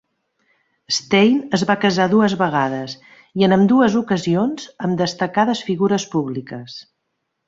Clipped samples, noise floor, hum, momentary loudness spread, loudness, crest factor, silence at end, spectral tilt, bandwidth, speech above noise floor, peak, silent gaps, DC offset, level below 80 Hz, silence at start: under 0.1%; -74 dBFS; none; 16 LU; -18 LUFS; 16 dB; 0.65 s; -5.5 dB/octave; 7.8 kHz; 57 dB; -2 dBFS; none; under 0.1%; -58 dBFS; 0.9 s